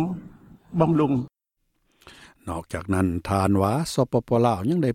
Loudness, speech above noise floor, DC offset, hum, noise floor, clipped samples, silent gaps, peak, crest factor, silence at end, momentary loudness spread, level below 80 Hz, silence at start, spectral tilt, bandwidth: -24 LUFS; 53 dB; under 0.1%; none; -75 dBFS; under 0.1%; none; -6 dBFS; 18 dB; 0 s; 13 LU; -50 dBFS; 0 s; -7 dB/octave; 16 kHz